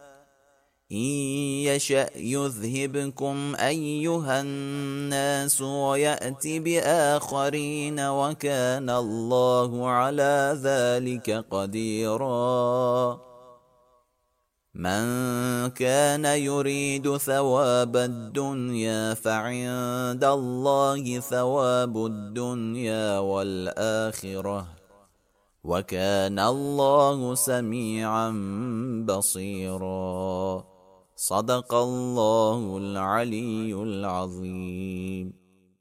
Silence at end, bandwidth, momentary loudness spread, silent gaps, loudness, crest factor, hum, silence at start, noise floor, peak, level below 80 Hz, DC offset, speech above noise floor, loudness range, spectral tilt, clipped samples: 0.5 s; 16 kHz; 9 LU; none; -26 LUFS; 18 dB; none; 0 s; -74 dBFS; -8 dBFS; -64 dBFS; under 0.1%; 48 dB; 4 LU; -4.5 dB/octave; under 0.1%